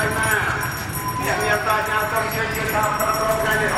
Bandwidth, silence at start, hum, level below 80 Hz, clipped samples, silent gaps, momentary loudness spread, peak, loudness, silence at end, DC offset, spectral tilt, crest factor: 17 kHz; 0 s; none; -40 dBFS; under 0.1%; none; 5 LU; -6 dBFS; -20 LUFS; 0 s; under 0.1%; -3.5 dB/octave; 16 dB